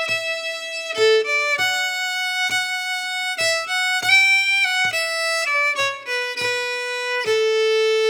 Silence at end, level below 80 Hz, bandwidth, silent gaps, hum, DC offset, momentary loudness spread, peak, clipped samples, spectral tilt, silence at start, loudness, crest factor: 0 s; -72 dBFS; over 20 kHz; none; none; under 0.1%; 9 LU; -4 dBFS; under 0.1%; 0.5 dB/octave; 0 s; -19 LUFS; 16 dB